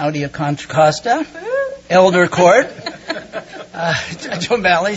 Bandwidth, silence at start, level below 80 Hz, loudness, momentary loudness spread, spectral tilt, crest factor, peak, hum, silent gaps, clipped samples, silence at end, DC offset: 8 kHz; 0 s; -52 dBFS; -16 LUFS; 15 LU; -5 dB/octave; 16 dB; 0 dBFS; none; none; under 0.1%; 0 s; under 0.1%